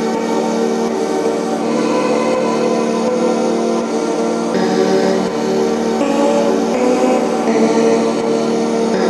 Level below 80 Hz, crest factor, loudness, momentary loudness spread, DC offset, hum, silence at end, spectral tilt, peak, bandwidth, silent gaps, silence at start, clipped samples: -54 dBFS; 14 dB; -15 LUFS; 4 LU; under 0.1%; none; 0 s; -5 dB/octave; -2 dBFS; 12.5 kHz; none; 0 s; under 0.1%